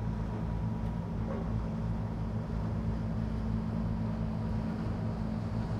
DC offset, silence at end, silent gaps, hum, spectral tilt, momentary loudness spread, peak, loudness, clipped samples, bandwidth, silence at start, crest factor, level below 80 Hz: under 0.1%; 0 s; none; none; -9 dB/octave; 2 LU; -22 dBFS; -35 LUFS; under 0.1%; 7.6 kHz; 0 s; 12 dB; -40 dBFS